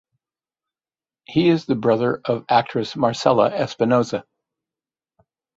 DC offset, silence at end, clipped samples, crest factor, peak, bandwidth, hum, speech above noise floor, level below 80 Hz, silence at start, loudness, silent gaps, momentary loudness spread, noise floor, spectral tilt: under 0.1%; 1.35 s; under 0.1%; 20 dB; -2 dBFS; 8 kHz; none; over 71 dB; -60 dBFS; 1.3 s; -20 LUFS; none; 7 LU; under -90 dBFS; -6.5 dB/octave